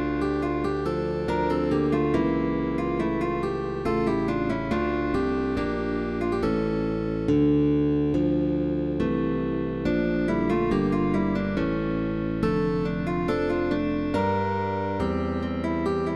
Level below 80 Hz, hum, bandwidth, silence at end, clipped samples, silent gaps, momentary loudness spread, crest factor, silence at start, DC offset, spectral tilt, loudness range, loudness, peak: -40 dBFS; none; 9 kHz; 0 s; under 0.1%; none; 4 LU; 14 dB; 0 s; 0.3%; -8.5 dB/octave; 2 LU; -25 LUFS; -12 dBFS